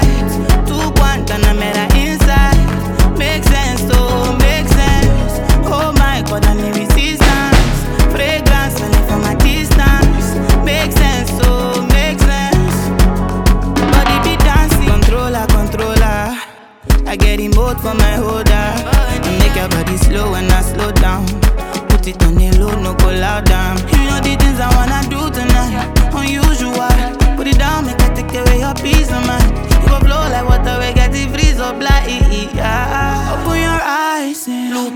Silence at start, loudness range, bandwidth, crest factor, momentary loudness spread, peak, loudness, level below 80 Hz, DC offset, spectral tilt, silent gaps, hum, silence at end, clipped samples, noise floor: 0 s; 2 LU; 18 kHz; 12 dB; 4 LU; 0 dBFS; -13 LUFS; -14 dBFS; under 0.1%; -5 dB/octave; none; none; 0 s; under 0.1%; -32 dBFS